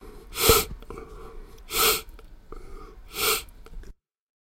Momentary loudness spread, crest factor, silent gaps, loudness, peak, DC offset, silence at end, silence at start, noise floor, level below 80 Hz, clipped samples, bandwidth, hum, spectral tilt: 26 LU; 26 dB; none; -23 LUFS; -2 dBFS; under 0.1%; 0.6 s; 0 s; -47 dBFS; -40 dBFS; under 0.1%; 16.5 kHz; none; -1.5 dB/octave